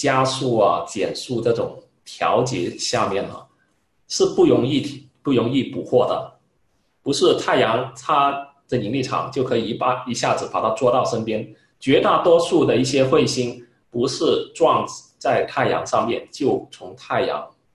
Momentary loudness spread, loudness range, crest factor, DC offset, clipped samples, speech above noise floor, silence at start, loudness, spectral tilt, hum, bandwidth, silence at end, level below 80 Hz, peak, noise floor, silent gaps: 12 LU; 3 LU; 18 dB; under 0.1%; under 0.1%; 47 dB; 0 s; -20 LUFS; -5 dB/octave; none; 12 kHz; 0.25 s; -56 dBFS; -2 dBFS; -67 dBFS; none